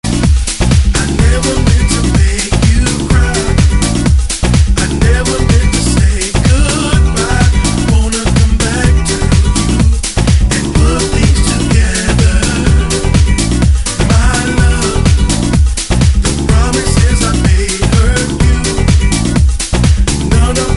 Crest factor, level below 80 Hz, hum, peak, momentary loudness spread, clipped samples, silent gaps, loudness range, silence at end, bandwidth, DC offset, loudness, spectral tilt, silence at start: 10 dB; -12 dBFS; none; 0 dBFS; 2 LU; under 0.1%; none; 0 LU; 0 s; 11.5 kHz; under 0.1%; -11 LUFS; -5 dB/octave; 0.05 s